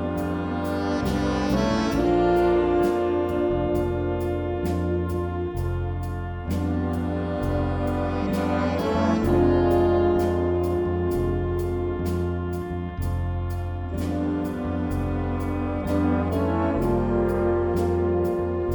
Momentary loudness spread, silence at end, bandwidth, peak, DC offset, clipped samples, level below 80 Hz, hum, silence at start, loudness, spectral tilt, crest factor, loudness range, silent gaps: 8 LU; 0 s; over 20 kHz; -8 dBFS; under 0.1%; under 0.1%; -36 dBFS; none; 0 s; -24 LUFS; -8 dB/octave; 14 dB; 5 LU; none